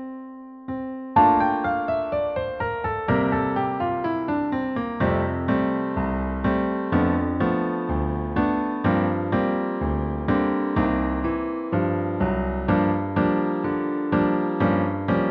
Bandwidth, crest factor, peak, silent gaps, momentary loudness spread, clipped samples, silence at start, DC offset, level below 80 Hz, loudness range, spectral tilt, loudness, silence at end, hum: 5.2 kHz; 18 dB; -6 dBFS; none; 5 LU; under 0.1%; 0 s; under 0.1%; -38 dBFS; 2 LU; -10.5 dB/octave; -24 LUFS; 0 s; none